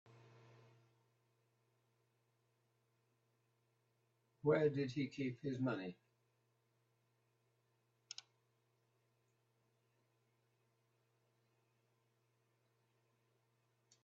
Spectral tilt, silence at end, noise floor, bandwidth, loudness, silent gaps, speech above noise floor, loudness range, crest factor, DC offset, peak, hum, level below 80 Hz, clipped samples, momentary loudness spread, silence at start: -6.5 dB/octave; 8.1 s; -82 dBFS; 7.4 kHz; -41 LUFS; none; 42 dB; 21 LU; 26 dB; under 0.1%; -22 dBFS; none; -86 dBFS; under 0.1%; 19 LU; 4.45 s